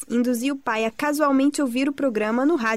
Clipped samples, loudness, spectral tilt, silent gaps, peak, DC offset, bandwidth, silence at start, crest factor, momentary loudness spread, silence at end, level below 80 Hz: under 0.1%; -22 LUFS; -4 dB/octave; none; -8 dBFS; 0.2%; 15.5 kHz; 0 s; 14 dB; 5 LU; 0 s; -64 dBFS